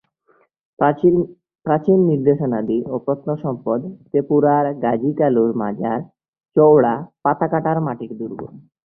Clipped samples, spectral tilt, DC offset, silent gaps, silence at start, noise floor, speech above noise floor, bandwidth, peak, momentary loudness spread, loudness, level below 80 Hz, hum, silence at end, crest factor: under 0.1%; -12.5 dB/octave; under 0.1%; 6.28-6.33 s; 0.8 s; -60 dBFS; 42 dB; 3.4 kHz; -2 dBFS; 12 LU; -18 LUFS; -58 dBFS; none; 0.25 s; 16 dB